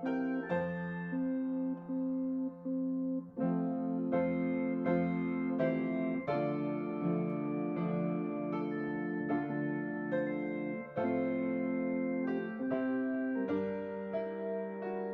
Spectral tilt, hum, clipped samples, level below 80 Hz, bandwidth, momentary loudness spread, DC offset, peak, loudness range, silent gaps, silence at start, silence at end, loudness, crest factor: -8 dB/octave; none; under 0.1%; -74 dBFS; 4.4 kHz; 5 LU; under 0.1%; -20 dBFS; 2 LU; none; 0 s; 0 s; -35 LUFS; 16 dB